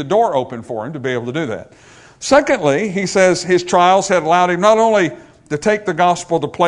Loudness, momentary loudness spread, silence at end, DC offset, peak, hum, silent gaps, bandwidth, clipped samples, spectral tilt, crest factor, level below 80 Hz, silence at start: -15 LUFS; 13 LU; 0 s; under 0.1%; 0 dBFS; none; none; 11 kHz; under 0.1%; -4.5 dB/octave; 16 dB; -52 dBFS; 0 s